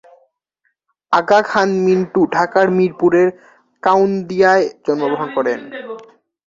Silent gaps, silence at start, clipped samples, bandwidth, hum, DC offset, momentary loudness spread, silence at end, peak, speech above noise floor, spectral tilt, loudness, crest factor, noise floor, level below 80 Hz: none; 1.1 s; under 0.1%; 7.4 kHz; none; under 0.1%; 8 LU; 0.45 s; -2 dBFS; 54 dB; -6.5 dB/octave; -15 LUFS; 16 dB; -69 dBFS; -60 dBFS